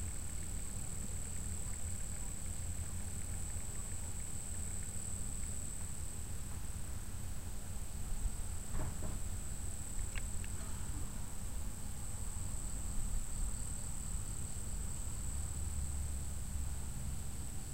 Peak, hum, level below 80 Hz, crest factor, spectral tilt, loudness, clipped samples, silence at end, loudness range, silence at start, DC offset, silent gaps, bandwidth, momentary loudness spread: -26 dBFS; none; -44 dBFS; 16 dB; -4 dB/octave; -43 LUFS; under 0.1%; 0 s; 2 LU; 0 s; 0.7%; none; 16 kHz; 3 LU